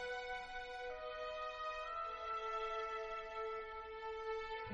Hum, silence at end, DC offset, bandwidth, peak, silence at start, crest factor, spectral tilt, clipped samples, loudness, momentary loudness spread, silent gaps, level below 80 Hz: none; 0 s; under 0.1%; 9 kHz; -32 dBFS; 0 s; 12 dB; -3 dB/octave; under 0.1%; -45 LUFS; 5 LU; none; -64 dBFS